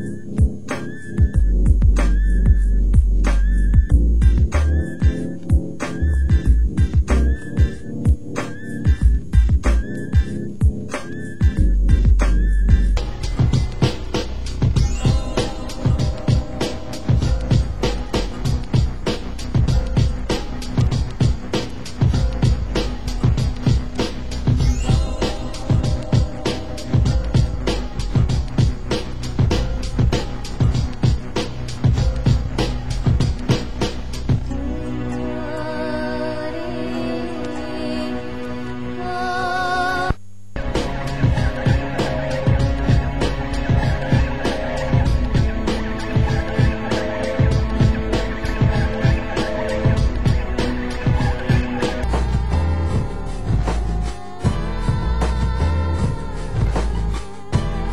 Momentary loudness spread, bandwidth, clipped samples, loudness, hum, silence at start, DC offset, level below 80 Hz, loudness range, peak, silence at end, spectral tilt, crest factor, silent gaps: 8 LU; 11.5 kHz; under 0.1%; -21 LUFS; none; 0 s; 3%; -22 dBFS; 4 LU; -2 dBFS; 0 s; -6.5 dB/octave; 16 dB; none